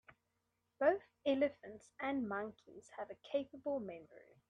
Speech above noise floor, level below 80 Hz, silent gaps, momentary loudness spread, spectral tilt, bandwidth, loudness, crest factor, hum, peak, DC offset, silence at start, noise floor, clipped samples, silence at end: 45 dB; -82 dBFS; none; 20 LU; -6 dB/octave; 9.4 kHz; -40 LUFS; 22 dB; none; -20 dBFS; under 0.1%; 0.8 s; -85 dBFS; under 0.1%; 0.3 s